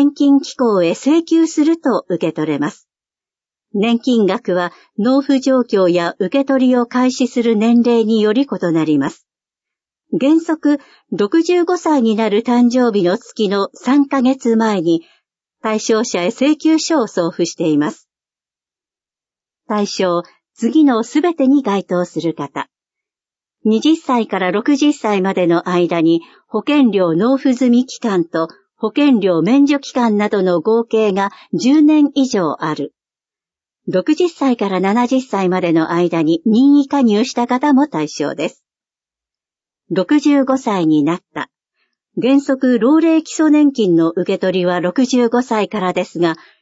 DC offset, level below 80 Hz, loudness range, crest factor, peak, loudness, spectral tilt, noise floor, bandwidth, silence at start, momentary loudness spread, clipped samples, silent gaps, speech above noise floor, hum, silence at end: under 0.1%; -68 dBFS; 4 LU; 12 dB; -2 dBFS; -15 LUFS; -5.5 dB/octave; under -90 dBFS; 8 kHz; 0 s; 8 LU; under 0.1%; none; over 76 dB; none; 0.25 s